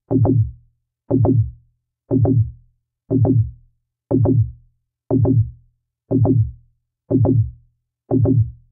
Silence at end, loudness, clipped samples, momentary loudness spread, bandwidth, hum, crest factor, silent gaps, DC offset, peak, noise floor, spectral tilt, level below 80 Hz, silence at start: 0.2 s; -19 LUFS; under 0.1%; 9 LU; 1.5 kHz; none; 14 dB; none; under 0.1%; -4 dBFS; -61 dBFS; -17 dB/octave; -40 dBFS; 0.1 s